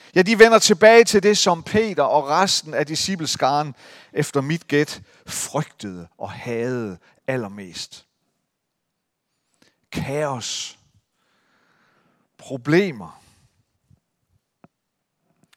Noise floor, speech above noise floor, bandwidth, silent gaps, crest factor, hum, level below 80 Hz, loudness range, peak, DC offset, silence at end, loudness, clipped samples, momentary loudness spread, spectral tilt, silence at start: -78 dBFS; 58 dB; 16 kHz; none; 22 dB; none; -58 dBFS; 14 LU; 0 dBFS; under 0.1%; 2.45 s; -19 LUFS; under 0.1%; 21 LU; -3.5 dB/octave; 0.15 s